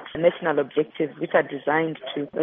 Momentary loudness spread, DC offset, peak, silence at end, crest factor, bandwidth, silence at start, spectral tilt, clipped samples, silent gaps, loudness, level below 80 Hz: 6 LU; under 0.1%; -4 dBFS; 0 s; 20 dB; 3.8 kHz; 0 s; -4 dB/octave; under 0.1%; none; -24 LUFS; -64 dBFS